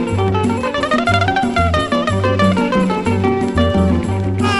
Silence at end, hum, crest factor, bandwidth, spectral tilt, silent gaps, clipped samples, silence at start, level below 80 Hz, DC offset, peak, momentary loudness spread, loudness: 0 s; none; 14 dB; 11.5 kHz; -6.5 dB/octave; none; under 0.1%; 0 s; -32 dBFS; under 0.1%; 0 dBFS; 3 LU; -16 LUFS